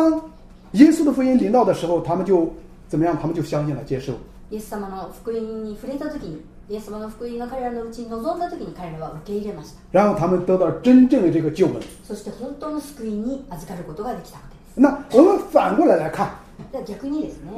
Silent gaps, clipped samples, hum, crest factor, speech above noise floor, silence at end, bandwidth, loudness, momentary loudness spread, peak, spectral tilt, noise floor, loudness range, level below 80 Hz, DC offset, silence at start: none; under 0.1%; none; 20 dB; 21 dB; 0 s; 14.5 kHz; -20 LUFS; 19 LU; 0 dBFS; -7.5 dB/octave; -42 dBFS; 11 LU; -46 dBFS; under 0.1%; 0 s